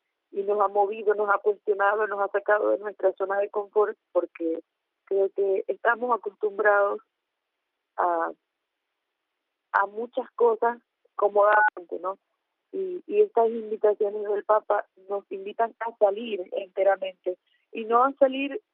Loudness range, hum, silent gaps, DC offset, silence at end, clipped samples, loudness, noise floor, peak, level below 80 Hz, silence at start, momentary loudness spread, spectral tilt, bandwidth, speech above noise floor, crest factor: 4 LU; none; none; under 0.1%; 0.15 s; under 0.1%; -26 LUFS; -82 dBFS; -6 dBFS; -82 dBFS; 0.35 s; 13 LU; -1.5 dB/octave; 3.9 kHz; 57 dB; 20 dB